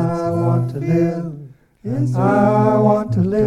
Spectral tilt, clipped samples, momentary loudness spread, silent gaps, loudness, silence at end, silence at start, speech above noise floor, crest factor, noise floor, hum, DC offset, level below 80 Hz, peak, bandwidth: -9.5 dB/octave; under 0.1%; 13 LU; none; -17 LUFS; 0 s; 0 s; 24 dB; 16 dB; -39 dBFS; none; under 0.1%; -46 dBFS; -2 dBFS; 9.8 kHz